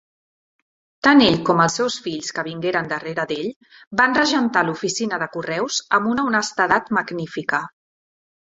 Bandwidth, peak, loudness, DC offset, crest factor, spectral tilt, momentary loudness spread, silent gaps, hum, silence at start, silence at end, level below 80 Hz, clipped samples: 8 kHz; -2 dBFS; -20 LUFS; under 0.1%; 20 dB; -4 dB/octave; 11 LU; 3.56-3.61 s, 3.87-3.91 s; none; 1.05 s; 0.75 s; -58 dBFS; under 0.1%